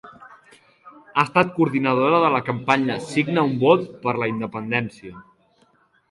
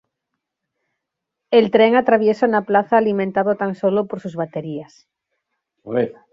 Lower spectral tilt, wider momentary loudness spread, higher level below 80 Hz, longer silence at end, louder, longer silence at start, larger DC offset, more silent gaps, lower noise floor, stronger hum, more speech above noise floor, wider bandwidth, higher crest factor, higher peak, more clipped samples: about the same, -6.5 dB/octave vs -7.5 dB/octave; second, 8 LU vs 12 LU; about the same, -62 dBFS vs -64 dBFS; first, 0.9 s vs 0.2 s; about the same, -20 LUFS vs -18 LUFS; second, 0.05 s vs 1.5 s; neither; neither; second, -60 dBFS vs -81 dBFS; neither; second, 40 dB vs 63 dB; first, 11.5 kHz vs 7.4 kHz; about the same, 20 dB vs 18 dB; about the same, -2 dBFS vs -2 dBFS; neither